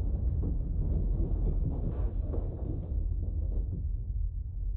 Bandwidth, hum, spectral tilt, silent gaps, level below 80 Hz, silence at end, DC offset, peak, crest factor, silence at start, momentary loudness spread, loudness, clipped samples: 1.5 kHz; none; -13.5 dB/octave; none; -32 dBFS; 0 s; under 0.1%; -20 dBFS; 12 dB; 0 s; 4 LU; -34 LUFS; under 0.1%